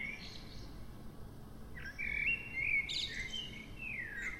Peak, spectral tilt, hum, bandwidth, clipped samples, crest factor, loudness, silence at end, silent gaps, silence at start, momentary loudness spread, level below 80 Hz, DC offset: -26 dBFS; -2.5 dB/octave; none; 16 kHz; under 0.1%; 16 dB; -37 LUFS; 0 s; none; 0 s; 19 LU; -54 dBFS; under 0.1%